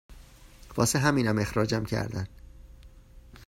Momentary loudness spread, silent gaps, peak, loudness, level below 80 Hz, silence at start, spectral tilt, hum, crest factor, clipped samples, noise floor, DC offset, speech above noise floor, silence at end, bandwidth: 13 LU; none; -10 dBFS; -27 LUFS; -48 dBFS; 0.1 s; -5 dB/octave; none; 20 dB; under 0.1%; -51 dBFS; under 0.1%; 24 dB; 0.05 s; 16 kHz